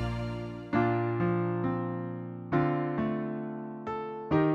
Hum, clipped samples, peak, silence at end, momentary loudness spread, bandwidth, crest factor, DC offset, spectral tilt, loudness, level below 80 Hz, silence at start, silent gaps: none; under 0.1%; -14 dBFS; 0 s; 10 LU; 7 kHz; 16 dB; under 0.1%; -9.5 dB/octave; -32 LUFS; -52 dBFS; 0 s; none